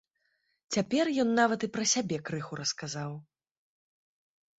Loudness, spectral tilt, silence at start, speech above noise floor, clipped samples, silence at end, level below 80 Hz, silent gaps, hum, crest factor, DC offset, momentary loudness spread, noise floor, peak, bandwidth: -30 LUFS; -3.5 dB/octave; 0.7 s; 47 dB; under 0.1%; 1.35 s; -72 dBFS; none; none; 22 dB; under 0.1%; 11 LU; -76 dBFS; -10 dBFS; 8.4 kHz